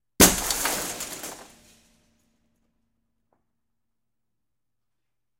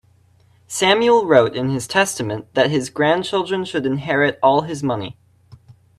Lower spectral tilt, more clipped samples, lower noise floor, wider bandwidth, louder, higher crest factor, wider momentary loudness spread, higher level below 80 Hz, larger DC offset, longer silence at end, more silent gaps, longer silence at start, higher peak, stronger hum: second, -2 dB/octave vs -4.5 dB/octave; neither; first, -85 dBFS vs -54 dBFS; first, 16 kHz vs 13.5 kHz; second, -22 LUFS vs -18 LUFS; first, 28 dB vs 18 dB; first, 19 LU vs 10 LU; first, -46 dBFS vs -58 dBFS; neither; first, 3.95 s vs 0.25 s; neither; second, 0.2 s vs 0.7 s; about the same, 0 dBFS vs 0 dBFS; neither